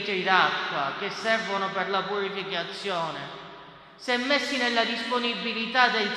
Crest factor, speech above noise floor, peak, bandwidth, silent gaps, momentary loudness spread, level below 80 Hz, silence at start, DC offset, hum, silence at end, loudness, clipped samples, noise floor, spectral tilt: 22 dB; 20 dB; -6 dBFS; 13 kHz; none; 13 LU; -70 dBFS; 0 s; under 0.1%; none; 0 s; -26 LUFS; under 0.1%; -47 dBFS; -3.5 dB/octave